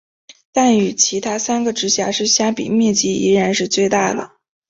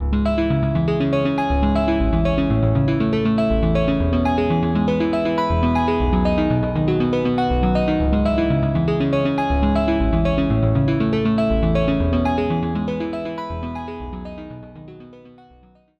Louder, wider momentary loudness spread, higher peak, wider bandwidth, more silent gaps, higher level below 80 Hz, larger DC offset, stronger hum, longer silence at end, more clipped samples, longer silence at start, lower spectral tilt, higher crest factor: first, -16 LUFS vs -19 LUFS; second, 6 LU vs 9 LU; first, -2 dBFS vs -6 dBFS; about the same, 8 kHz vs 8.2 kHz; neither; second, -56 dBFS vs -28 dBFS; neither; neither; second, 0.45 s vs 0.7 s; neither; first, 0.55 s vs 0 s; second, -3 dB/octave vs -9 dB/octave; about the same, 16 dB vs 12 dB